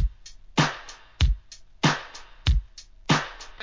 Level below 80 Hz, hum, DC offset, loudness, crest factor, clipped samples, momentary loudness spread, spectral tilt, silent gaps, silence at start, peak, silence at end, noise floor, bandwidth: -30 dBFS; none; 0.2%; -27 LUFS; 20 dB; under 0.1%; 15 LU; -4.5 dB/octave; none; 0 s; -6 dBFS; 0 s; -44 dBFS; 7.6 kHz